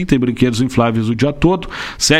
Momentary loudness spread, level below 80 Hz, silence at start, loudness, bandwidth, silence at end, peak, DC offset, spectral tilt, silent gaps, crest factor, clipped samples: 4 LU; -32 dBFS; 0 s; -16 LUFS; 15.5 kHz; 0 s; 0 dBFS; under 0.1%; -5 dB/octave; none; 14 dB; under 0.1%